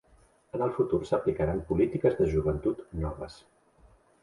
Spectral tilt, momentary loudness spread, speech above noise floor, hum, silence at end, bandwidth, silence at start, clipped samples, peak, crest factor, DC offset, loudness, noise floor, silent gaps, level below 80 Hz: -9 dB/octave; 10 LU; 34 dB; none; 0.85 s; 11 kHz; 0.55 s; under 0.1%; -12 dBFS; 18 dB; under 0.1%; -29 LUFS; -62 dBFS; none; -44 dBFS